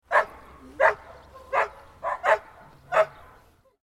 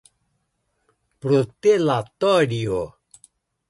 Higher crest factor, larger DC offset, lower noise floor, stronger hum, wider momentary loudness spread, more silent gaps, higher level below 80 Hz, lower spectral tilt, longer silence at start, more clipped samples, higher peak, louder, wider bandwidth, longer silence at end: first, 22 dB vs 16 dB; neither; second, -57 dBFS vs -72 dBFS; neither; about the same, 12 LU vs 10 LU; neither; about the same, -58 dBFS vs -56 dBFS; second, -3.5 dB/octave vs -6.5 dB/octave; second, 0.1 s vs 1.25 s; neither; about the same, -6 dBFS vs -6 dBFS; second, -26 LUFS vs -21 LUFS; first, 13.5 kHz vs 11.5 kHz; about the same, 0.75 s vs 0.8 s